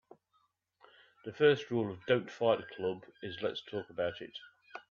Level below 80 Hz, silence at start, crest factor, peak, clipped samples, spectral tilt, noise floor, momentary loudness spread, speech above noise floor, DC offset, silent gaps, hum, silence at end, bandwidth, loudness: -76 dBFS; 1.25 s; 22 dB; -14 dBFS; under 0.1%; -6.5 dB/octave; -76 dBFS; 20 LU; 43 dB; under 0.1%; none; none; 0.1 s; 7 kHz; -34 LUFS